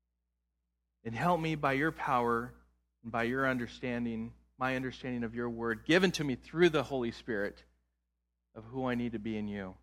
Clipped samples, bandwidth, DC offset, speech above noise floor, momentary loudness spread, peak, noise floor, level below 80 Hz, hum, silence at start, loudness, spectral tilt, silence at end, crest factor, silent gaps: under 0.1%; 15.5 kHz; under 0.1%; 51 dB; 13 LU; -12 dBFS; -84 dBFS; -60 dBFS; none; 1.05 s; -33 LUFS; -6 dB/octave; 0.05 s; 22 dB; none